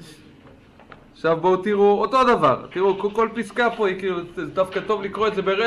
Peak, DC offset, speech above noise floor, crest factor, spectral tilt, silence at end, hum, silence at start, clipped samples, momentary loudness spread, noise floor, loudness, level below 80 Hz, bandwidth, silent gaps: -6 dBFS; under 0.1%; 28 dB; 16 dB; -6 dB/octave; 0 s; none; 0 s; under 0.1%; 9 LU; -48 dBFS; -21 LUFS; -54 dBFS; 11.5 kHz; none